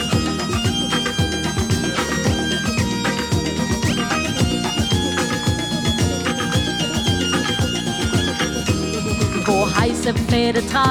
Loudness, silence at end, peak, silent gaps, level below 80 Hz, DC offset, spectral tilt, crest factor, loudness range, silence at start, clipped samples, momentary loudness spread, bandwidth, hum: -19 LUFS; 0 s; -4 dBFS; none; -34 dBFS; under 0.1%; -4.5 dB/octave; 16 dB; 1 LU; 0 s; under 0.1%; 3 LU; 19 kHz; none